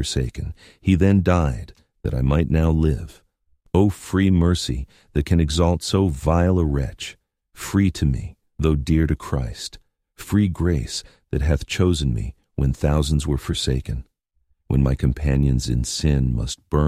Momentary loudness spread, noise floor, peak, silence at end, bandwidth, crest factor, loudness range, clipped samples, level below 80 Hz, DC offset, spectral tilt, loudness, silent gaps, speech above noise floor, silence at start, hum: 12 LU; -67 dBFS; -2 dBFS; 0 s; 15 kHz; 18 dB; 3 LU; under 0.1%; -28 dBFS; under 0.1%; -6.5 dB/octave; -21 LUFS; none; 47 dB; 0 s; none